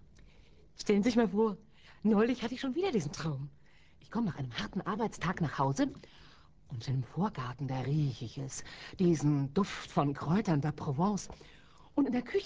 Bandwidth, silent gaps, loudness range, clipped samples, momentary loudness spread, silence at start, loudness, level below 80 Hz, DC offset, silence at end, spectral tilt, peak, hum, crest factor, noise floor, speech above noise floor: 8 kHz; none; 4 LU; under 0.1%; 13 LU; 0.8 s; -33 LUFS; -58 dBFS; under 0.1%; 0 s; -6.5 dB/octave; -14 dBFS; none; 18 dB; -60 dBFS; 28 dB